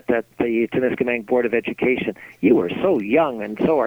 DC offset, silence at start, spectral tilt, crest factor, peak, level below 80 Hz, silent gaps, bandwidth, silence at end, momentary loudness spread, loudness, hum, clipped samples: under 0.1%; 0.1 s; -8 dB/octave; 16 dB; -4 dBFS; -54 dBFS; none; 17 kHz; 0 s; 5 LU; -20 LUFS; none; under 0.1%